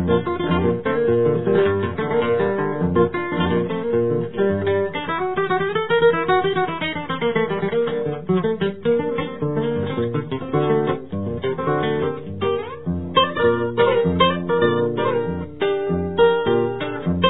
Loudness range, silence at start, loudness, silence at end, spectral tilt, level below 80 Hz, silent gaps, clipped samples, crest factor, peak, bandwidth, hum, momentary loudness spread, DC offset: 3 LU; 0 s; -21 LUFS; 0 s; -10.5 dB/octave; -48 dBFS; none; under 0.1%; 18 dB; -2 dBFS; 4.1 kHz; none; 7 LU; 0.8%